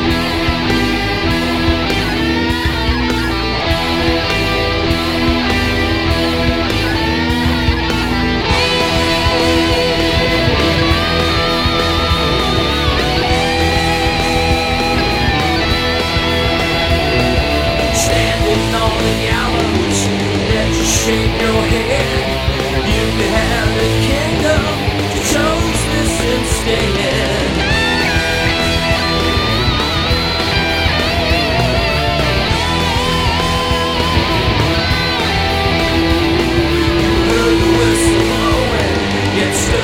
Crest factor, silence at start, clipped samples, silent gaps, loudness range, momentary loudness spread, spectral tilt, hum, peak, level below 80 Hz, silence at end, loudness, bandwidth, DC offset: 14 dB; 0 s; under 0.1%; none; 2 LU; 2 LU; -4.5 dB/octave; none; 0 dBFS; -24 dBFS; 0 s; -14 LUFS; 16.5 kHz; 0.5%